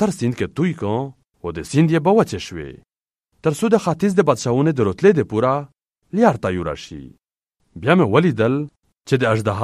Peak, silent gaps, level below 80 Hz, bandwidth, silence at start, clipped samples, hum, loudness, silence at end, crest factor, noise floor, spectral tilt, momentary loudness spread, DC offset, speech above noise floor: 0 dBFS; none; -50 dBFS; 13.5 kHz; 0 s; under 0.1%; none; -18 LUFS; 0 s; 18 dB; -76 dBFS; -7 dB/octave; 15 LU; under 0.1%; 58 dB